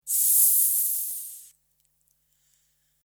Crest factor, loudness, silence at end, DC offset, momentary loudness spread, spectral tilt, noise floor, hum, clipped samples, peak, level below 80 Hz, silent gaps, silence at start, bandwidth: 22 dB; -19 LUFS; 1.6 s; under 0.1%; 17 LU; 6.5 dB/octave; -70 dBFS; none; under 0.1%; -6 dBFS; -84 dBFS; none; 0.05 s; over 20 kHz